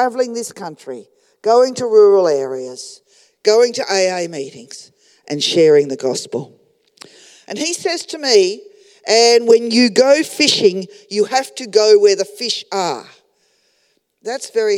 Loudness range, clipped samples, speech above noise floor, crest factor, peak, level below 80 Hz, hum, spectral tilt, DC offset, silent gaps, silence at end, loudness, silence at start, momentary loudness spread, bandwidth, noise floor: 6 LU; under 0.1%; 48 dB; 16 dB; 0 dBFS; -76 dBFS; none; -3 dB/octave; under 0.1%; none; 0 s; -14 LUFS; 0 s; 20 LU; 14.5 kHz; -63 dBFS